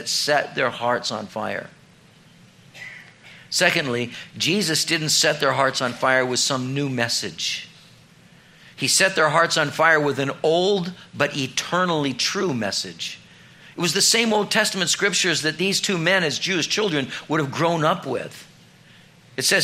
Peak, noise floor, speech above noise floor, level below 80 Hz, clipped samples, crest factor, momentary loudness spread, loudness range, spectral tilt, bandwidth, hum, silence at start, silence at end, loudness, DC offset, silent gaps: 0 dBFS; -51 dBFS; 30 dB; -66 dBFS; under 0.1%; 22 dB; 12 LU; 5 LU; -2.5 dB/octave; 16 kHz; none; 0 s; 0 s; -21 LUFS; under 0.1%; none